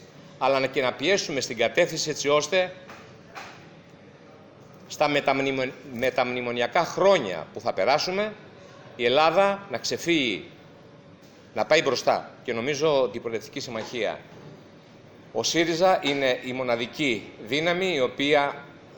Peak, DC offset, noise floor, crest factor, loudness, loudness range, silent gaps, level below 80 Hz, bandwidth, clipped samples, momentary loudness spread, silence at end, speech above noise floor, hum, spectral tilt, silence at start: -6 dBFS; under 0.1%; -50 dBFS; 20 dB; -25 LUFS; 5 LU; none; -62 dBFS; over 20 kHz; under 0.1%; 14 LU; 0 s; 25 dB; none; -3.5 dB/octave; 0 s